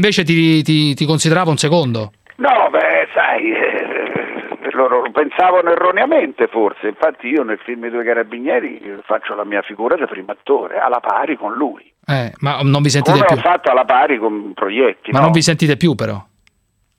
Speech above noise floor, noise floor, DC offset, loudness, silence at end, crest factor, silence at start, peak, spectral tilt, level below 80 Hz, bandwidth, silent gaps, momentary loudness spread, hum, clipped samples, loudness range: 48 dB; -63 dBFS; under 0.1%; -15 LUFS; 0.75 s; 16 dB; 0 s; 0 dBFS; -5.5 dB/octave; -58 dBFS; 14 kHz; none; 10 LU; none; under 0.1%; 5 LU